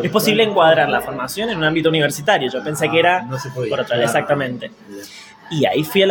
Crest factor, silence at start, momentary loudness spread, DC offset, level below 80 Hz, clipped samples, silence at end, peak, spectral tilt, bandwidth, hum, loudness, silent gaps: 16 dB; 0 s; 15 LU; under 0.1%; -54 dBFS; under 0.1%; 0 s; -2 dBFS; -4.5 dB/octave; 17.5 kHz; none; -17 LUFS; none